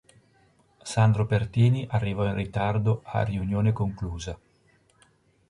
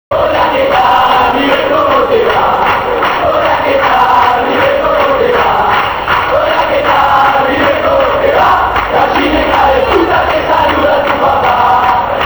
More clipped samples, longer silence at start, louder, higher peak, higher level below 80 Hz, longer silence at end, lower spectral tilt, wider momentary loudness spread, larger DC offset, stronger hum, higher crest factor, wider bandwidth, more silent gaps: neither; first, 0.85 s vs 0.1 s; second, -26 LUFS vs -9 LUFS; second, -8 dBFS vs 0 dBFS; second, -46 dBFS vs -32 dBFS; first, 1.15 s vs 0 s; first, -7 dB/octave vs -5.5 dB/octave; first, 12 LU vs 3 LU; neither; neither; first, 18 dB vs 10 dB; second, 11 kHz vs over 20 kHz; neither